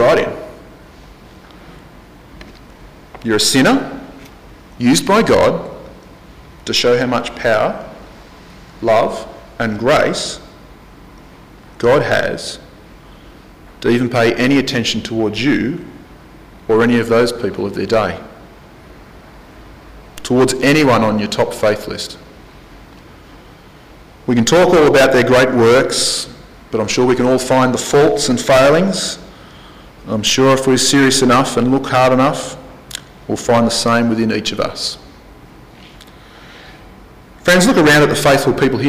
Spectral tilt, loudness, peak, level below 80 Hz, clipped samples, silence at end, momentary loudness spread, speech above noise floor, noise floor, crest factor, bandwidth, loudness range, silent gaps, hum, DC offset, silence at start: -4 dB/octave; -14 LUFS; -4 dBFS; -42 dBFS; under 0.1%; 0 s; 18 LU; 27 dB; -40 dBFS; 12 dB; 16 kHz; 7 LU; none; none; under 0.1%; 0 s